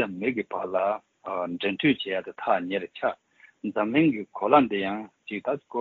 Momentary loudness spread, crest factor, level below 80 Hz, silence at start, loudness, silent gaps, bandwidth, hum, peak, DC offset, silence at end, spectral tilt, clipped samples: 12 LU; 22 dB; -68 dBFS; 0 s; -27 LUFS; none; 4.4 kHz; none; -6 dBFS; under 0.1%; 0 s; -3.5 dB/octave; under 0.1%